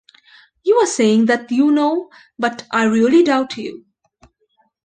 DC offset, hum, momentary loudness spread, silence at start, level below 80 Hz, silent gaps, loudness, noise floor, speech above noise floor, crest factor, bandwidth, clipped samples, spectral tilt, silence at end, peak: under 0.1%; none; 12 LU; 0.65 s; -62 dBFS; none; -16 LUFS; -63 dBFS; 47 dB; 14 dB; 9.8 kHz; under 0.1%; -4.5 dB/octave; 1.05 s; -4 dBFS